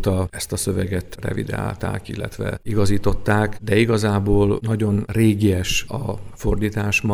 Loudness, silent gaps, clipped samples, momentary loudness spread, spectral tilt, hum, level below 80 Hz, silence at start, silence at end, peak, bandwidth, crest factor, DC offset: -21 LUFS; none; under 0.1%; 10 LU; -6 dB/octave; none; -34 dBFS; 0 s; 0 s; -2 dBFS; 15 kHz; 16 dB; under 0.1%